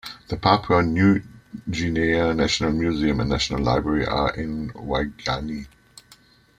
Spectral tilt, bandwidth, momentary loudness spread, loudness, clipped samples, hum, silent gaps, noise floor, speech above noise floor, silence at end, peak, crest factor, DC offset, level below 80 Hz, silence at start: -5.5 dB/octave; 15 kHz; 13 LU; -22 LUFS; under 0.1%; none; none; -54 dBFS; 32 dB; 0.9 s; -2 dBFS; 22 dB; under 0.1%; -38 dBFS; 0.05 s